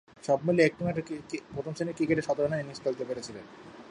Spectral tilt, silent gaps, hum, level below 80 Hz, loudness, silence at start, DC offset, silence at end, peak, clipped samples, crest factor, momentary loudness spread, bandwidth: -6.5 dB/octave; none; none; -62 dBFS; -30 LUFS; 0.25 s; under 0.1%; 0 s; -10 dBFS; under 0.1%; 20 dB; 16 LU; 11 kHz